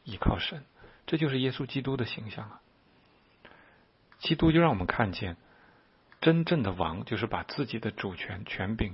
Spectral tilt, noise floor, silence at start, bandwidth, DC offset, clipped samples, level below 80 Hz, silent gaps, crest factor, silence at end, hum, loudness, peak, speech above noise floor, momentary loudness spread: -10.5 dB/octave; -63 dBFS; 0.05 s; 5.8 kHz; under 0.1%; under 0.1%; -46 dBFS; none; 22 dB; 0 s; none; -30 LUFS; -8 dBFS; 34 dB; 14 LU